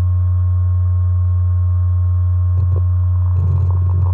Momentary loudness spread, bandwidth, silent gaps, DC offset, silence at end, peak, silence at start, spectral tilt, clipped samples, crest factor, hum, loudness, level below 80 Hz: 0 LU; 1.5 kHz; none; under 0.1%; 0 s; -8 dBFS; 0 s; -12 dB/octave; under 0.1%; 6 dB; none; -16 LUFS; -36 dBFS